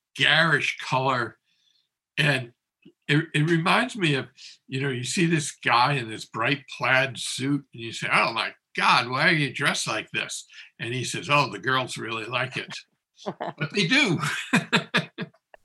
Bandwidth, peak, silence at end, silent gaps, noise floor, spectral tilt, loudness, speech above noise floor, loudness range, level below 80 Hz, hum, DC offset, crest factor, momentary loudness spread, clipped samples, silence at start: 12.5 kHz; -4 dBFS; 0.35 s; none; -70 dBFS; -4 dB/octave; -24 LUFS; 45 dB; 3 LU; -72 dBFS; none; under 0.1%; 22 dB; 14 LU; under 0.1%; 0.15 s